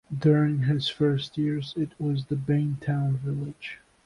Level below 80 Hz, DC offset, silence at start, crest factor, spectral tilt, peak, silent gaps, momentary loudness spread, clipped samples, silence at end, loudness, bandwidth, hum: -58 dBFS; under 0.1%; 0.1 s; 16 dB; -8 dB/octave; -10 dBFS; none; 10 LU; under 0.1%; 0.3 s; -27 LUFS; 10.5 kHz; none